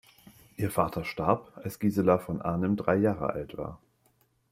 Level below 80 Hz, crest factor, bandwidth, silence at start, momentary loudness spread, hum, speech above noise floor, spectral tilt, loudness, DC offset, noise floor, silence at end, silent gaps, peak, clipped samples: -56 dBFS; 22 dB; 16 kHz; 0.25 s; 14 LU; none; 40 dB; -7.5 dB/octave; -29 LUFS; under 0.1%; -69 dBFS; 0.75 s; none; -8 dBFS; under 0.1%